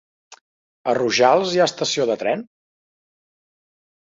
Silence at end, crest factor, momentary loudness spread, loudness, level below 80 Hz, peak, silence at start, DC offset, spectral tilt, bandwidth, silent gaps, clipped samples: 1.7 s; 20 dB; 10 LU; -19 LUFS; -68 dBFS; -2 dBFS; 0.3 s; under 0.1%; -3.5 dB/octave; 8 kHz; 0.41-0.85 s; under 0.1%